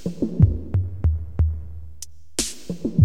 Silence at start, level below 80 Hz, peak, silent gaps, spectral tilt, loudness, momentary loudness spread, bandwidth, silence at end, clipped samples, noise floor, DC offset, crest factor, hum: 0.05 s; -30 dBFS; -2 dBFS; none; -6 dB/octave; -24 LUFS; 19 LU; 14.5 kHz; 0 s; under 0.1%; -43 dBFS; 2%; 20 dB; none